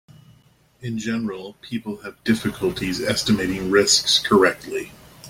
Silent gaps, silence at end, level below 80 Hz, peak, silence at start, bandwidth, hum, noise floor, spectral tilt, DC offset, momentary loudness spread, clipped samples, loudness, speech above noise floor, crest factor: none; 0 s; -50 dBFS; -2 dBFS; 0.8 s; 16.5 kHz; none; -56 dBFS; -3 dB/octave; under 0.1%; 16 LU; under 0.1%; -21 LUFS; 35 dB; 20 dB